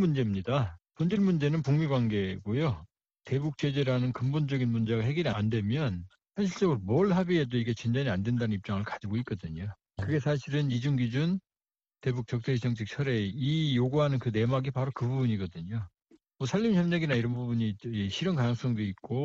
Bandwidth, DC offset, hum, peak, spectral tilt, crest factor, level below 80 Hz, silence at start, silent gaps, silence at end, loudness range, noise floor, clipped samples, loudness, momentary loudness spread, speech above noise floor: 7.6 kHz; under 0.1%; none; -14 dBFS; -7.5 dB/octave; 16 dB; -58 dBFS; 0 s; none; 0 s; 2 LU; under -90 dBFS; under 0.1%; -30 LUFS; 8 LU; over 61 dB